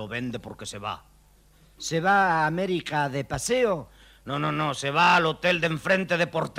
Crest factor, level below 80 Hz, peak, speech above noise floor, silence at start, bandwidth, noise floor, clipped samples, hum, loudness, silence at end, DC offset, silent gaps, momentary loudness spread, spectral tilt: 18 dB; -54 dBFS; -8 dBFS; 32 dB; 0 s; 16 kHz; -57 dBFS; under 0.1%; none; -24 LUFS; 0 s; under 0.1%; none; 15 LU; -4.5 dB/octave